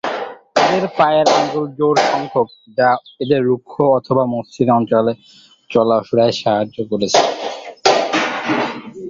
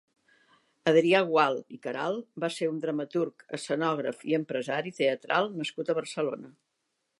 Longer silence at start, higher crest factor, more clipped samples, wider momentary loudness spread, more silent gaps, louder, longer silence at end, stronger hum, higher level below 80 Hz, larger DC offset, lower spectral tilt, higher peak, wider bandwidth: second, 0.05 s vs 0.85 s; about the same, 16 dB vs 20 dB; neither; second, 7 LU vs 10 LU; neither; first, -16 LUFS vs -29 LUFS; second, 0 s vs 0.7 s; neither; first, -58 dBFS vs -84 dBFS; neither; about the same, -4.5 dB/octave vs -5 dB/octave; first, 0 dBFS vs -10 dBFS; second, 7.8 kHz vs 11.5 kHz